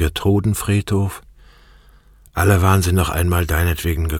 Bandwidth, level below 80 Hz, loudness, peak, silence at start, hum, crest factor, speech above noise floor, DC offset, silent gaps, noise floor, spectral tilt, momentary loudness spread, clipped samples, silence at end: 17 kHz; -28 dBFS; -18 LUFS; -2 dBFS; 0 s; none; 16 dB; 31 dB; under 0.1%; none; -48 dBFS; -5.5 dB/octave; 7 LU; under 0.1%; 0 s